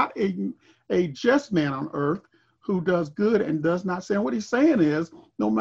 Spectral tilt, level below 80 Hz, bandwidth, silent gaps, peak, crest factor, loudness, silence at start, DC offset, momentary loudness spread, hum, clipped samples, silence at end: -7 dB/octave; -62 dBFS; 7.8 kHz; none; -6 dBFS; 18 dB; -25 LUFS; 0 s; under 0.1%; 8 LU; none; under 0.1%; 0 s